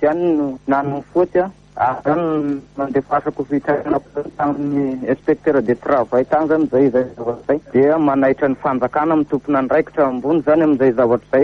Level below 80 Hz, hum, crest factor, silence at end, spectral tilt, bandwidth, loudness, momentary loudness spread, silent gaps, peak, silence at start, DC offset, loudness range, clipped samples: -52 dBFS; none; 14 dB; 0 s; -9 dB/octave; 6.2 kHz; -17 LUFS; 7 LU; none; -2 dBFS; 0 s; under 0.1%; 4 LU; under 0.1%